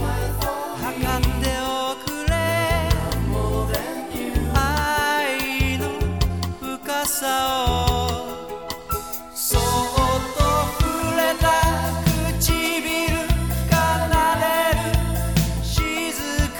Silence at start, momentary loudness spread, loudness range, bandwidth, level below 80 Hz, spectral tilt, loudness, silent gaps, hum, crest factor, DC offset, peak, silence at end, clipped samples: 0 s; 8 LU; 3 LU; over 20 kHz; -28 dBFS; -4.5 dB/octave; -22 LUFS; none; none; 18 dB; 0.3%; -2 dBFS; 0 s; under 0.1%